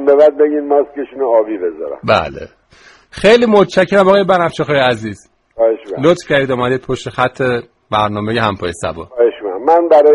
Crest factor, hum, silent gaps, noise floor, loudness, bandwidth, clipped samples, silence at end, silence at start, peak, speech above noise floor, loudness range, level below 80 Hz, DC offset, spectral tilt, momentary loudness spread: 12 dB; none; none; -45 dBFS; -13 LUFS; 11.5 kHz; under 0.1%; 0 s; 0 s; 0 dBFS; 33 dB; 4 LU; -44 dBFS; under 0.1%; -6 dB/octave; 12 LU